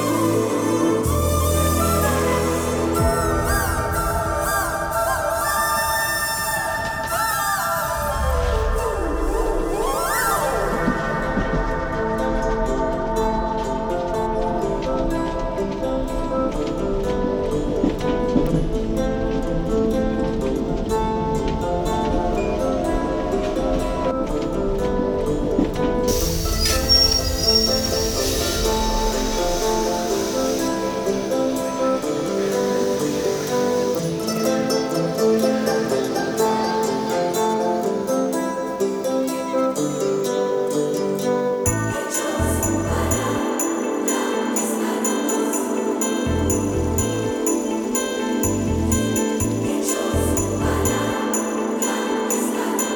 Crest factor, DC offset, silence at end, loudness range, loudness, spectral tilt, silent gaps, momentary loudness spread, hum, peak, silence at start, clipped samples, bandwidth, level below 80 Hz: 16 dB; under 0.1%; 0 s; 4 LU; -21 LUFS; -4 dB/octave; none; 4 LU; none; -4 dBFS; 0 s; under 0.1%; over 20 kHz; -30 dBFS